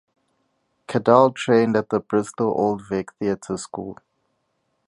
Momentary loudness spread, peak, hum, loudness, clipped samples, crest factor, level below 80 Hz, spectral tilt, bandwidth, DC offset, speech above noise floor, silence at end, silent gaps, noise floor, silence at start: 14 LU; -2 dBFS; none; -21 LUFS; under 0.1%; 22 dB; -60 dBFS; -6 dB/octave; 11.5 kHz; under 0.1%; 51 dB; 0.95 s; none; -72 dBFS; 0.9 s